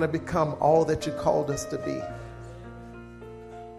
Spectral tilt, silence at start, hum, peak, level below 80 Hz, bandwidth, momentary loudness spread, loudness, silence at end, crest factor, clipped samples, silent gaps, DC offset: -6 dB/octave; 0 s; none; -8 dBFS; -50 dBFS; 14 kHz; 21 LU; -26 LUFS; 0 s; 20 dB; under 0.1%; none; under 0.1%